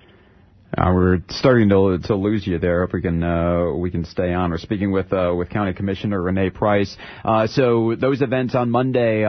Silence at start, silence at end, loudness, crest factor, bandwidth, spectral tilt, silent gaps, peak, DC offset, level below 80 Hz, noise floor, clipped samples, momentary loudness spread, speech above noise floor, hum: 0.7 s; 0 s; -20 LUFS; 16 dB; 6.4 kHz; -8 dB/octave; none; -2 dBFS; under 0.1%; -40 dBFS; -51 dBFS; under 0.1%; 6 LU; 32 dB; none